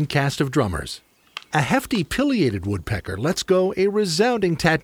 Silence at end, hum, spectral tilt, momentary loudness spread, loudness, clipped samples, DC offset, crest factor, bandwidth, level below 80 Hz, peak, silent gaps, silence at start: 0.05 s; none; -5.5 dB/octave; 10 LU; -21 LUFS; under 0.1%; under 0.1%; 18 dB; 19.5 kHz; -44 dBFS; -4 dBFS; none; 0 s